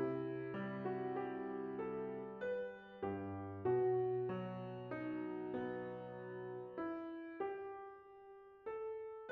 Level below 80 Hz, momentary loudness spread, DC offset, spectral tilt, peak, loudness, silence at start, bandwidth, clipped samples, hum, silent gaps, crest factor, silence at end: -78 dBFS; 11 LU; under 0.1%; -7 dB/octave; -28 dBFS; -44 LUFS; 0 s; 4.5 kHz; under 0.1%; none; none; 16 dB; 0 s